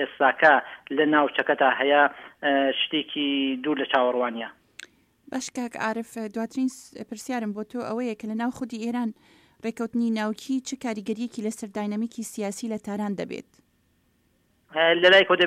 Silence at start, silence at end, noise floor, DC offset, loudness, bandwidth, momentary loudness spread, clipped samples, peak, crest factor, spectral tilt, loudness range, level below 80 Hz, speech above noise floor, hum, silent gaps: 0 s; 0 s; -67 dBFS; under 0.1%; -25 LUFS; 15.5 kHz; 15 LU; under 0.1%; -4 dBFS; 20 dB; -3.5 dB/octave; 9 LU; -70 dBFS; 42 dB; none; none